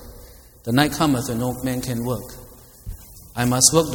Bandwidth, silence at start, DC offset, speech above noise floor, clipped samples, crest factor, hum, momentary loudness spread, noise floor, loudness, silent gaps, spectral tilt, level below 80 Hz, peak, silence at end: 20 kHz; 0 s; under 0.1%; 24 dB; under 0.1%; 22 dB; none; 24 LU; -44 dBFS; -20 LUFS; none; -3.5 dB/octave; -42 dBFS; 0 dBFS; 0 s